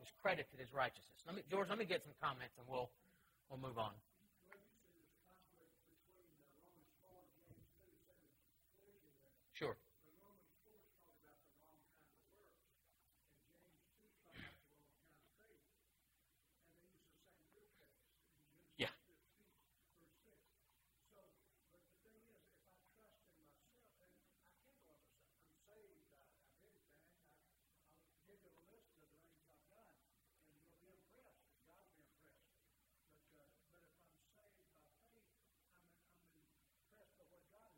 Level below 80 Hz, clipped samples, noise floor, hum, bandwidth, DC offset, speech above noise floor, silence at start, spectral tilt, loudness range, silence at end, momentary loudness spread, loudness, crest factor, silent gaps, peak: -84 dBFS; under 0.1%; -82 dBFS; none; 16 kHz; under 0.1%; 35 dB; 0 s; -5 dB/octave; 21 LU; 0.55 s; 23 LU; -47 LUFS; 30 dB; none; -26 dBFS